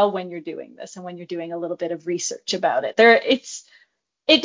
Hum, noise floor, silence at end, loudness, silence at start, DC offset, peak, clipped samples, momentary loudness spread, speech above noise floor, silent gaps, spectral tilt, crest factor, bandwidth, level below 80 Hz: none; -62 dBFS; 0 s; -21 LUFS; 0 s; under 0.1%; 0 dBFS; under 0.1%; 21 LU; 40 dB; none; -2.5 dB/octave; 20 dB; 7.6 kHz; -70 dBFS